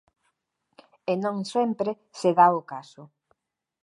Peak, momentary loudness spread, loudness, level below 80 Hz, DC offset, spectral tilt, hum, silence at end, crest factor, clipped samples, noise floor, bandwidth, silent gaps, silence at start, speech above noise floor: -6 dBFS; 17 LU; -24 LUFS; -82 dBFS; under 0.1%; -6 dB/octave; none; 0.8 s; 22 dB; under 0.1%; -76 dBFS; 11.5 kHz; none; 1.1 s; 51 dB